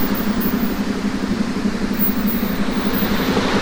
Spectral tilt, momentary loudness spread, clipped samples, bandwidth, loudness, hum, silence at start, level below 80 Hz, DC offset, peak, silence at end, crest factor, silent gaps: -5.5 dB/octave; 4 LU; under 0.1%; over 20 kHz; -19 LUFS; none; 0 s; -32 dBFS; under 0.1%; -6 dBFS; 0 s; 14 dB; none